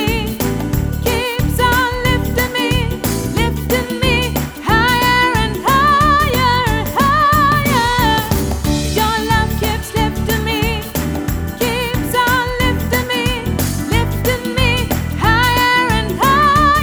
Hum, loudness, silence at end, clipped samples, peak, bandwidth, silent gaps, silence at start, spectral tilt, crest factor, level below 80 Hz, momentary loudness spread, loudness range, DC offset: none; -15 LUFS; 0 s; under 0.1%; 0 dBFS; over 20 kHz; none; 0 s; -4.5 dB/octave; 14 dB; -24 dBFS; 7 LU; 4 LU; under 0.1%